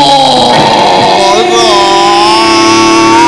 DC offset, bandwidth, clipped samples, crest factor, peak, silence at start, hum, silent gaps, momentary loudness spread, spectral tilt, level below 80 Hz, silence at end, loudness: 1%; 11 kHz; 5%; 4 dB; 0 dBFS; 0 s; none; none; 1 LU; -3 dB/octave; -38 dBFS; 0 s; -4 LUFS